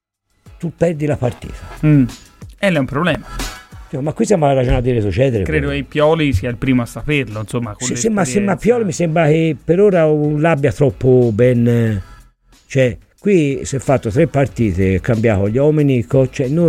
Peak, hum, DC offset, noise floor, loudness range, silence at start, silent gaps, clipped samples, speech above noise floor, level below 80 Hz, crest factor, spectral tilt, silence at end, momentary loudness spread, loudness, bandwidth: -2 dBFS; none; under 0.1%; -48 dBFS; 4 LU; 0.45 s; none; under 0.1%; 34 dB; -34 dBFS; 14 dB; -6.5 dB/octave; 0 s; 9 LU; -15 LUFS; 15 kHz